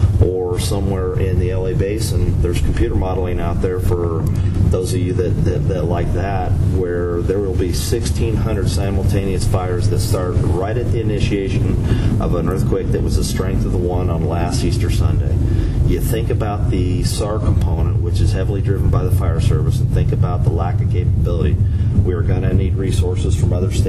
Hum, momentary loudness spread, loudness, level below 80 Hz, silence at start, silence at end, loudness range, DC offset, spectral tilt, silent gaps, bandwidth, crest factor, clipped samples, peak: none; 2 LU; -18 LUFS; -22 dBFS; 0 s; 0 s; 2 LU; under 0.1%; -7 dB/octave; none; 14 kHz; 12 dB; under 0.1%; -4 dBFS